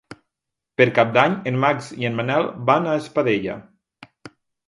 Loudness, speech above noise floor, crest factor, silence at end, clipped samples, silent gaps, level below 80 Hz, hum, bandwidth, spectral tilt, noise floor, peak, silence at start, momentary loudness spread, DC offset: -20 LUFS; 64 dB; 22 dB; 0.4 s; under 0.1%; none; -62 dBFS; none; 11.5 kHz; -6.5 dB/octave; -83 dBFS; 0 dBFS; 0.1 s; 9 LU; under 0.1%